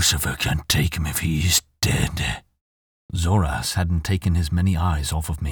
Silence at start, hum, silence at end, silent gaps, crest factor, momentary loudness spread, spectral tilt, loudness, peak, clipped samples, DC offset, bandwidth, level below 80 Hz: 0 s; none; 0 s; 2.61-3.09 s; 18 dB; 7 LU; -4 dB/octave; -22 LUFS; -4 dBFS; under 0.1%; under 0.1%; over 20 kHz; -32 dBFS